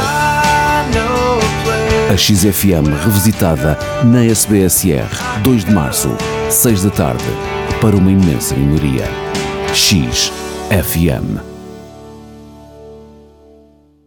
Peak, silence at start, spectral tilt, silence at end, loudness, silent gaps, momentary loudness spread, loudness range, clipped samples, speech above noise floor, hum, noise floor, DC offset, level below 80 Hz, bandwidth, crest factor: 0 dBFS; 0 s; -4.5 dB/octave; 1 s; -13 LUFS; none; 9 LU; 6 LU; under 0.1%; 34 dB; none; -46 dBFS; under 0.1%; -30 dBFS; over 20 kHz; 12 dB